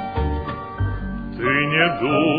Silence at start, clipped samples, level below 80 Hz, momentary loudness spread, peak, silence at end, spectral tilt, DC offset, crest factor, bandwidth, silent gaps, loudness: 0 s; under 0.1%; -32 dBFS; 11 LU; -4 dBFS; 0 s; -9.5 dB/octave; under 0.1%; 18 dB; 5 kHz; none; -21 LUFS